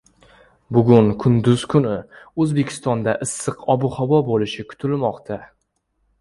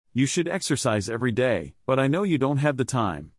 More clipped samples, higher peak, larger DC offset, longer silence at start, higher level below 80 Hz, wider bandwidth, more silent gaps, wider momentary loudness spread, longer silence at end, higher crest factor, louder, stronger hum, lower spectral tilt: neither; first, 0 dBFS vs -8 dBFS; neither; first, 0.7 s vs 0.15 s; first, -50 dBFS vs -56 dBFS; about the same, 11.5 kHz vs 12 kHz; neither; first, 13 LU vs 4 LU; first, 0.75 s vs 0.1 s; about the same, 20 dB vs 16 dB; first, -19 LUFS vs -24 LUFS; neither; about the same, -6.5 dB/octave vs -5.5 dB/octave